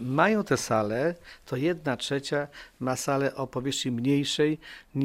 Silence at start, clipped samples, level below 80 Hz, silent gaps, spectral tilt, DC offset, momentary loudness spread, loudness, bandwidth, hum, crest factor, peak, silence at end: 0 s; under 0.1%; -60 dBFS; none; -5 dB/octave; under 0.1%; 11 LU; -28 LUFS; 16 kHz; none; 20 dB; -8 dBFS; 0 s